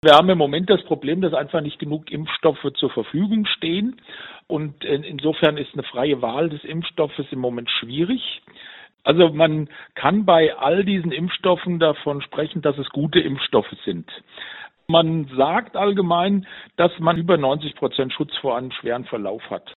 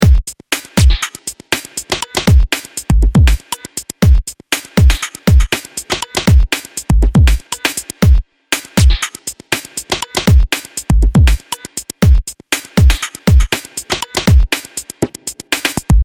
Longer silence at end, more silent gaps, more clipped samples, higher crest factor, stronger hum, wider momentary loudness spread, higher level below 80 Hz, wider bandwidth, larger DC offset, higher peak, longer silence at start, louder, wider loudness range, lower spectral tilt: about the same, 0.05 s vs 0 s; neither; neither; first, 20 dB vs 12 dB; neither; first, 12 LU vs 9 LU; second, -58 dBFS vs -14 dBFS; second, 4.6 kHz vs 18.5 kHz; neither; about the same, 0 dBFS vs 0 dBFS; about the same, 0.05 s vs 0 s; second, -21 LUFS vs -14 LUFS; first, 4 LU vs 1 LU; about the same, -4 dB/octave vs -4.5 dB/octave